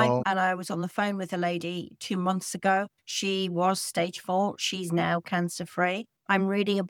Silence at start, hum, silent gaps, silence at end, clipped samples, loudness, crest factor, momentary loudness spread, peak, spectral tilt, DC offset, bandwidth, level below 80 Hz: 0 s; none; none; 0 s; under 0.1%; -28 LUFS; 20 dB; 6 LU; -8 dBFS; -4.5 dB/octave; under 0.1%; 17.5 kHz; -72 dBFS